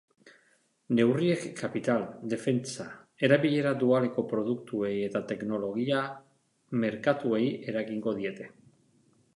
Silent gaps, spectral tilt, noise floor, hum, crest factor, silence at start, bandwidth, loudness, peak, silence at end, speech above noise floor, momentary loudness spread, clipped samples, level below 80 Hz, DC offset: none; -6.5 dB/octave; -68 dBFS; none; 20 dB; 0.25 s; 11.5 kHz; -29 LUFS; -10 dBFS; 0.85 s; 40 dB; 11 LU; under 0.1%; -74 dBFS; under 0.1%